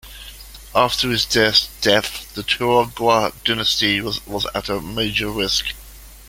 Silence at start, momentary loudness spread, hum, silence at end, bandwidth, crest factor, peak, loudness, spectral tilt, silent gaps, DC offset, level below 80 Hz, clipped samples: 0.05 s; 12 LU; none; 0 s; 17 kHz; 20 dB; -2 dBFS; -18 LUFS; -3 dB/octave; none; under 0.1%; -42 dBFS; under 0.1%